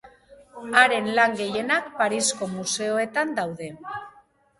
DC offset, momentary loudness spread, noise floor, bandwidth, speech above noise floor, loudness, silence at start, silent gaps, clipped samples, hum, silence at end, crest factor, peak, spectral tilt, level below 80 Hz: under 0.1%; 18 LU; -51 dBFS; 11.5 kHz; 27 dB; -23 LUFS; 0.05 s; none; under 0.1%; none; 0.5 s; 24 dB; -2 dBFS; -2.5 dB/octave; -66 dBFS